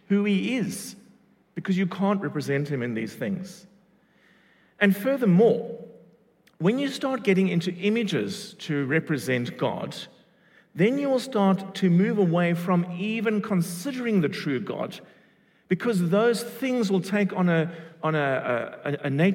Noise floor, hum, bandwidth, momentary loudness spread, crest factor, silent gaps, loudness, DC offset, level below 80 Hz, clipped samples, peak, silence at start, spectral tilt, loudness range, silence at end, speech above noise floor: -61 dBFS; none; 17 kHz; 11 LU; 20 dB; none; -25 LUFS; under 0.1%; -76 dBFS; under 0.1%; -6 dBFS; 0.1 s; -6.5 dB/octave; 4 LU; 0 s; 37 dB